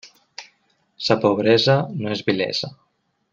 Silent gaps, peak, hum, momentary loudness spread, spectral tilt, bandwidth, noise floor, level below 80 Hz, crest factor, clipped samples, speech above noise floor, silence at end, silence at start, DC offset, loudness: none; -2 dBFS; none; 23 LU; -5.5 dB/octave; 7.6 kHz; -64 dBFS; -62 dBFS; 20 dB; under 0.1%; 45 dB; 0.6 s; 0.05 s; under 0.1%; -20 LUFS